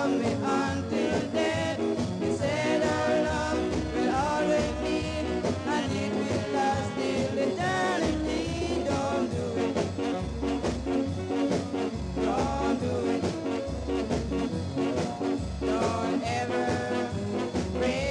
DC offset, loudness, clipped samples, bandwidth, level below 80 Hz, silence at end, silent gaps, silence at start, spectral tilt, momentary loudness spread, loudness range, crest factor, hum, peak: under 0.1%; -28 LUFS; under 0.1%; 11.5 kHz; -44 dBFS; 0 s; none; 0 s; -5.5 dB/octave; 4 LU; 2 LU; 14 dB; none; -14 dBFS